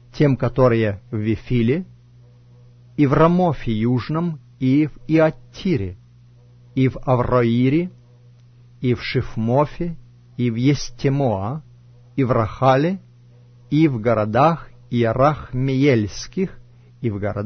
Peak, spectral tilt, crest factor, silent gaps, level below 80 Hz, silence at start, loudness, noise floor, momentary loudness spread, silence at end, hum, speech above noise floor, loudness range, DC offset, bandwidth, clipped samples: -4 dBFS; -8 dB/octave; 16 dB; none; -40 dBFS; 0.15 s; -20 LUFS; -48 dBFS; 11 LU; 0 s; none; 30 dB; 3 LU; under 0.1%; 6.6 kHz; under 0.1%